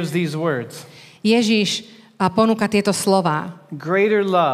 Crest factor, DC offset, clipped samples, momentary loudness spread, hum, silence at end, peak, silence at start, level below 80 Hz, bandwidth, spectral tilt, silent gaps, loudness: 16 dB; under 0.1%; under 0.1%; 11 LU; none; 0 s; -4 dBFS; 0 s; -64 dBFS; 15.5 kHz; -5 dB/octave; none; -19 LUFS